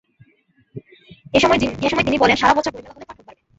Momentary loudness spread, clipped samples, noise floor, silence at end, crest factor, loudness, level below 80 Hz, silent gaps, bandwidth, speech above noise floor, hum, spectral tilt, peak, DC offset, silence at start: 16 LU; under 0.1%; -60 dBFS; 0.45 s; 20 dB; -17 LUFS; -44 dBFS; none; 8 kHz; 43 dB; none; -4.5 dB/octave; -2 dBFS; under 0.1%; 0.75 s